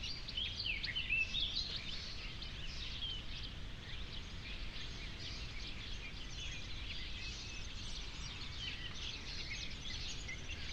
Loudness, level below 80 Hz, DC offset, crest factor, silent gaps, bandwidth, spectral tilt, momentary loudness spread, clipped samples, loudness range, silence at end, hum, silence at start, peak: -43 LUFS; -50 dBFS; under 0.1%; 18 dB; none; 10.5 kHz; -2.5 dB/octave; 10 LU; under 0.1%; 7 LU; 0 s; none; 0 s; -26 dBFS